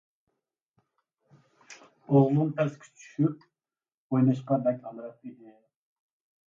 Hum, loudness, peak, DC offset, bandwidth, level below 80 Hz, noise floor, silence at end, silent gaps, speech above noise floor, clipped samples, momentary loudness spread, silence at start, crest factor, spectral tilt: none; -27 LUFS; -10 dBFS; under 0.1%; 7.6 kHz; -76 dBFS; under -90 dBFS; 1.15 s; 3.94-4.10 s; over 64 dB; under 0.1%; 24 LU; 1.7 s; 22 dB; -9.5 dB/octave